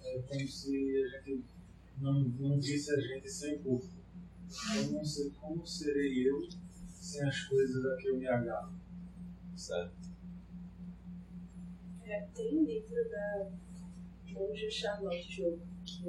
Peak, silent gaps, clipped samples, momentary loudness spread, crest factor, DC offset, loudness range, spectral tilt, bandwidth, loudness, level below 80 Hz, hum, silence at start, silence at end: -20 dBFS; none; under 0.1%; 17 LU; 18 dB; under 0.1%; 7 LU; -6 dB/octave; 12.5 kHz; -37 LUFS; -58 dBFS; none; 0 s; 0 s